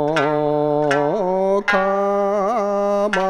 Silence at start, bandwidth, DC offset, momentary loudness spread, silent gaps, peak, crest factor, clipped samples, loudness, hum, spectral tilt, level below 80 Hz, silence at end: 0 s; 10.5 kHz; under 0.1%; 2 LU; none; -4 dBFS; 14 dB; under 0.1%; -18 LUFS; none; -6 dB/octave; -52 dBFS; 0 s